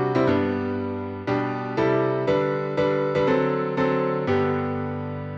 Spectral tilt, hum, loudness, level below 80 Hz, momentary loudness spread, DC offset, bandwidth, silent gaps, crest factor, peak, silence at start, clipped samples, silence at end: -8.5 dB/octave; none; -24 LUFS; -56 dBFS; 7 LU; under 0.1%; 7.2 kHz; none; 14 dB; -10 dBFS; 0 s; under 0.1%; 0 s